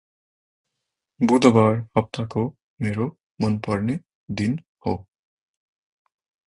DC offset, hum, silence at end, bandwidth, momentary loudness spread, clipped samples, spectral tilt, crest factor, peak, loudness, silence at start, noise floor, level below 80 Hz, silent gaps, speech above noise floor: under 0.1%; none; 1.45 s; 11 kHz; 14 LU; under 0.1%; -7 dB/octave; 22 dB; -2 dBFS; -23 LUFS; 1.2 s; -82 dBFS; -52 dBFS; 2.63-2.77 s, 3.23-3.35 s, 4.15-4.28 s, 4.68-4.75 s; 61 dB